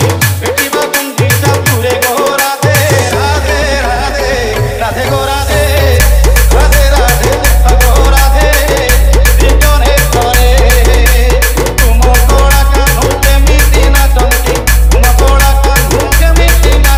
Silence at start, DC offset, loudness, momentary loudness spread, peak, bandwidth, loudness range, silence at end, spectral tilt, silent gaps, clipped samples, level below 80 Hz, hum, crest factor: 0 s; under 0.1%; -8 LUFS; 4 LU; 0 dBFS; 16.5 kHz; 2 LU; 0 s; -4 dB/octave; none; 0.8%; -8 dBFS; none; 6 dB